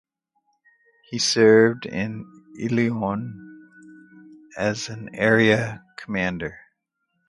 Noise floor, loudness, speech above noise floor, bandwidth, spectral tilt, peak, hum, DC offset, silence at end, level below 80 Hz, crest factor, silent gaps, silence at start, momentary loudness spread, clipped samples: -75 dBFS; -21 LUFS; 54 dB; 11.5 kHz; -4.5 dB/octave; -4 dBFS; none; under 0.1%; 0.75 s; -56 dBFS; 20 dB; none; 1.1 s; 21 LU; under 0.1%